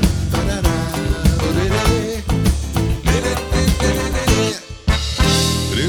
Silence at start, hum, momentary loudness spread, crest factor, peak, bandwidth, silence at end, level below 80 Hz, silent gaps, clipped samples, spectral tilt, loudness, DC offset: 0 s; none; 5 LU; 16 dB; -2 dBFS; 20 kHz; 0 s; -22 dBFS; none; under 0.1%; -5 dB/octave; -18 LUFS; under 0.1%